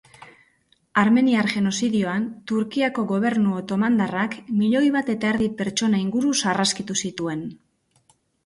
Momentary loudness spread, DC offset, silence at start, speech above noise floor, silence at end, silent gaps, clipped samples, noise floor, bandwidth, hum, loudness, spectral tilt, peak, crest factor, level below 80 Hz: 7 LU; under 0.1%; 0.2 s; 42 dB; 0.9 s; none; under 0.1%; -63 dBFS; 11.5 kHz; none; -22 LUFS; -4.5 dB/octave; -6 dBFS; 16 dB; -60 dBFS